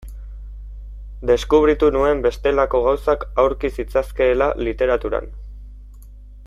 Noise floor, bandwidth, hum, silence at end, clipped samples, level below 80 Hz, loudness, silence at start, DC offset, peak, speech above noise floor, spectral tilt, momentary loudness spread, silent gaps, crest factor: -39 dBFS; 13.5 kHz; 50 Hz at -30 dBFS; 0 s; under 0.1%; -32 dBFS; -19 LUFS; 0 s; under 0.1%; -2 dBFS; 21 dB; -6.5 dB/octave; 22 LU; none; 18 dB